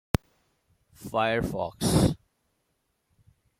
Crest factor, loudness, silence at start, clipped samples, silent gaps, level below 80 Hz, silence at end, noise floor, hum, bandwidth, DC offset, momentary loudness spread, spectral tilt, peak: 24 dB; -27 LUFS; 1 s; under 0.1%; none; -46 dBFS; 1.45 s; -76 dBFS; none; 16.5 kHz; under 0.1%; 12 LU; -5.5 dB/octave; -6 dBFS